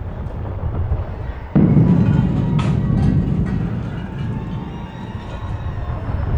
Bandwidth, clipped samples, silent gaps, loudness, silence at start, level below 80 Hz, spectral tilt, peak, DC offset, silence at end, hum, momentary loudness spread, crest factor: 7.6 kHz; under 0.1%; none; -20 LUFS; 0 s; -28 dBFS; -9.5 dB/octave; -2 dBFS; under 0.1%; 0 s; none; 15 LU; 18 dB